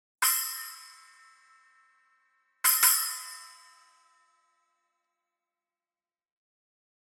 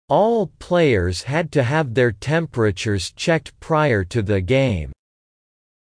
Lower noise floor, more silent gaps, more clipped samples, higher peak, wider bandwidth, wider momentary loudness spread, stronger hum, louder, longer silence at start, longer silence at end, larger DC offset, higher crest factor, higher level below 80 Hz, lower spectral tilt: about the same, under -90 dBFS vs under -90 dBFS; neither; neither; about the same, -6 dBFS vs -6 dBFS; first, 19 kHz vs 10.5 kHz; first, 22 LU vs 6 LU; neither; second, -25 LUFS vs -20 LUFS; about the same, 0.2 s vs 0.1 s; first, 3.55 s vs 1.05 s; neither; first, 28 dB vs 14 dB; second, under -90 dBFS vs -42 dBFS; second, 5.5 dB/octave vs -6 dB/octave